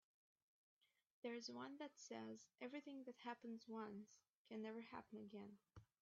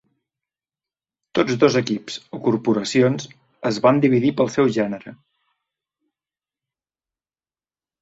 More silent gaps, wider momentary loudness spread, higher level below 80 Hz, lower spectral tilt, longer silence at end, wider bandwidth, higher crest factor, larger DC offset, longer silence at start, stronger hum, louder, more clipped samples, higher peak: first, 4.32-4.45 s vs none; second, 7 LU vs 11 LU; second, under -90 dBFS vs -62 dBFS; second, -3.5 dB/octave vs -6 dB/octave; second, 0.15 s vs 2.9 s; about the same, 7.4 kHz vs 8 kHz; about the same, 18 dB vs 20 dB; neither; about the same, 1.25 s vs 1.35 s; neither; second, -56 LUFS vs -20 LUFS; neither; second, -38 dBFS vs -2 dBFS